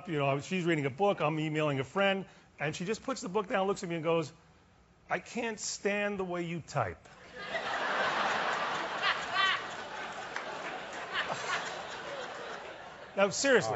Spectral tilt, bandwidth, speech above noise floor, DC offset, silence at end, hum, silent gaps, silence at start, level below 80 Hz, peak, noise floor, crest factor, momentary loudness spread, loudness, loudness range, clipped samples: -3 dB/octave; 8 kHz; 30 dB; under 0.1%; 0 s; none; none; 0 s; -68 dBFS; -12 dBFS; -62 dBFS; 20 dB; 11 LU; -33 LUFS; 4 LU; under 0.1%